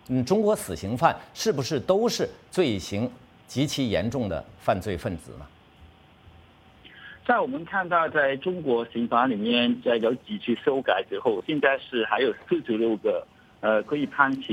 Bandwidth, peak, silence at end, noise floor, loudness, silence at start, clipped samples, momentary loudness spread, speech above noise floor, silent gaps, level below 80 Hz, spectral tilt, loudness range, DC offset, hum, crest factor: 16.5 kHz; -4 dBFS; 0 s; -53 dBFS; -25 LUFS; 0.1 s; under 0.1%; 8 LU; 28 dB; none; -56 dBFS; -5 dB/octave; 6 LU; under 0.1%; none; 22 dB